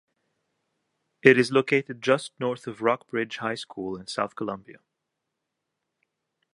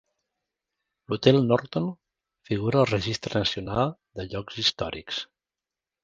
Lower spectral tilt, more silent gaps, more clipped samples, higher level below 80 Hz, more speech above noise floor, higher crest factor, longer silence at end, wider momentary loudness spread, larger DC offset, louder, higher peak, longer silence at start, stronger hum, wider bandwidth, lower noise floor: about the same, -5 dB/octave vs -5.5 dB/octave; neither; neither; second, -70 dBFS vs -52 dBFS; second, 57 dB vs 65 dB; about the same, 28 dB vs 26 dB; first, 1.85 s vs 0.8 s; about the same, 15 LU vs 13 LU; neither; about the same, -25 LUFS vs -26 LUFS; about the same, 0 dBFS vs -2 dBFS; first, 1.25 s vs 1.1 s; neither; first, 11.5 kHz vs 9.2 kHz; second, -82 dBFS vs -90 dBFS